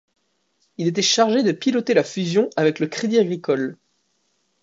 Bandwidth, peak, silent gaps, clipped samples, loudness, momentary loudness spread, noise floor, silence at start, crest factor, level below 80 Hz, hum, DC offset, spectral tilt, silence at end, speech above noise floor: 7.8 kHz; -2 dBFS; none; under 0.1%; -20 LUFS; 7 LU; -69 dBFS; 0.8 s; 18 dB; -72 dBFS; none; under 0.1%; -4.5 dB/octave; 0.9 s; 49 dB